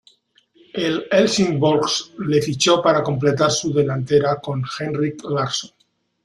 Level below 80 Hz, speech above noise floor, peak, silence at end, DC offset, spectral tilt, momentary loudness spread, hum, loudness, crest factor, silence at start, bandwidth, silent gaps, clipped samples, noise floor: -58 dBFS; 40 dB; -2 dBFS; 0.55 s; under 0.1%; -4.5 dB/octave; 9 LU; none; -19 LUFS; 18 dB; 0.75 s; 12.5 kHz; none; under 0.1%; -58 dBFS